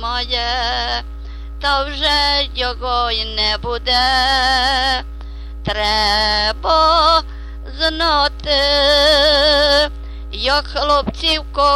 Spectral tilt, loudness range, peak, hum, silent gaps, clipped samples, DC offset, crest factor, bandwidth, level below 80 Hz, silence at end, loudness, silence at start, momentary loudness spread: -3 dB/octave; 4 LU; -2 dBFS; none; none; under 0.1%; under 0.1%; 14 dB; 13.5 kHz; -28 dBFS; 0 s; -15 LUFS; 0 s; 15 LU